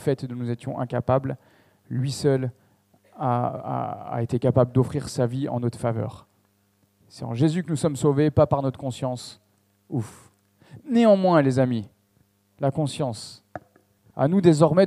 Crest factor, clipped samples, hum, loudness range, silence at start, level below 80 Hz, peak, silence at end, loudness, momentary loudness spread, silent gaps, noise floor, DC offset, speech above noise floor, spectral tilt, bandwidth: 20 dB; under 0.1%; none; 4 LU; 0 s; -56 dBFS; -4 dBFS; 0 s; -24 LUFS; 18 LU; none; -65 dBFS; under 0.1%; 43 dB; -7.5 dB/octave; 13 kHz